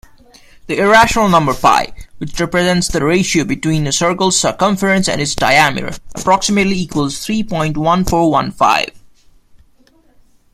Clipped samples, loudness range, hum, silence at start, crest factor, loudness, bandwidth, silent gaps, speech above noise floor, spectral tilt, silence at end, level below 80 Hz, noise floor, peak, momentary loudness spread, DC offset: under 0.1%; 3 LU; none; 0.65 s; 14 dB; -14 LUFS; 15.5 kHz; none; 36 dB; -4 dB/octave; 1.55 s; -36 dBFS; -50 dBFS; 0 dBFS; 10 LU; under 0.1%